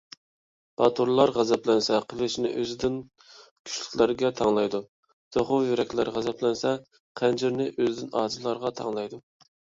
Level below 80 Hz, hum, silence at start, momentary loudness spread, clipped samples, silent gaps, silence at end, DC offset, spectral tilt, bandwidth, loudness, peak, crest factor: -62 dBFS; none; 0.8 s; 12 LU; under 0.1%; 3.51-3.65 s, 4.88-5.03 s, 5.13-5.31 s, 7.00-7.15 s; 0.55 s; under 0.1%; -5 dB/octave; 7.8 kHz; -26 LUFS; -6 dBFS; 22 dB